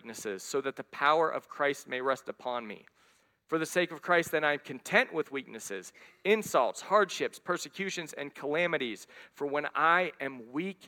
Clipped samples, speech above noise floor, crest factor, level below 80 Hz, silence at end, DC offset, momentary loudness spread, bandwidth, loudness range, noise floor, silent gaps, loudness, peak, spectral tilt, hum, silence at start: under 0.1%; 36 dB; 22 dB; -78 dBFS; 0 s; under 0.1%; 13 LU; 17.5 kHz; 2 LU; -67 dBFS; none; -31 LUFS; -10 dBFS; -3.5 dB/octave; none; 0.05 s